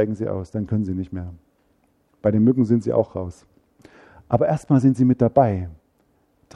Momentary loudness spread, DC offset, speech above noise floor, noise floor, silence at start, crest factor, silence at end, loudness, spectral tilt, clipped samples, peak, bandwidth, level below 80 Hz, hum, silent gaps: 15 LU; under 0.1%; 44 dB; -63 dBFS; 0 s; 20 dB; 0.8 s; -21 LUFS; -10 dB/octave; under 0.1%; -2 dBFS; 10 kHz; -52 dBFS; none; none